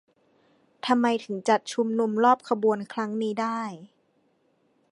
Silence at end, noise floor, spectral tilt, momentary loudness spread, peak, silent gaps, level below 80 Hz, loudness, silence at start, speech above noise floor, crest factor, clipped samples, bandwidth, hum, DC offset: 1.05 s; -68 dBFS; -5 dB/octave; 11 LU; -8 dBFS; none; -80 dBFS; -25 LUFS; 0.85 s; 43 dB; 20 dB; under 0.1%; 11.5 kHz; none; under 0.1%